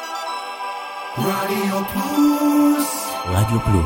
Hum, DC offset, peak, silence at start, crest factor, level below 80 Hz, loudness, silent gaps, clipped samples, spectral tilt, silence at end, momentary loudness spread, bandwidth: none; under 0.1%; -6 dBFS; 0 s; 14 dB; -40 dBFS; -20 LUFS; none; under 0.1%; -5.5 dB/octave; 0 s; 12 LU; 17 kHz